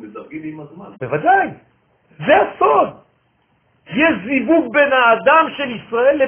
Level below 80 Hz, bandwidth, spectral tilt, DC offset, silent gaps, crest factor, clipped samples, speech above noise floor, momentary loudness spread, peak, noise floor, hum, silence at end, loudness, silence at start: -56 dBFS; 3.5 kHz; -8.5 dB/octave; under 0.1%; none; 16 dB; under 0.1%; 46 dB; 18 LU; 0 dBFS; -61 dBFS; none; 0 s; -15 LUFS; 0 s